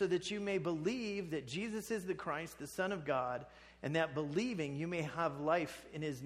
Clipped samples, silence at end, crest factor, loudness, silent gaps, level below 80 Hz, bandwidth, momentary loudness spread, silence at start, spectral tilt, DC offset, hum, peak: under 0.1%; 0 s; 18 dB; -39 LUFS; none; -68 dBFS; 15 kHz; 7 LU; 0 s; -5.5 dB/octave; under 0.1%; none; -20 dBFS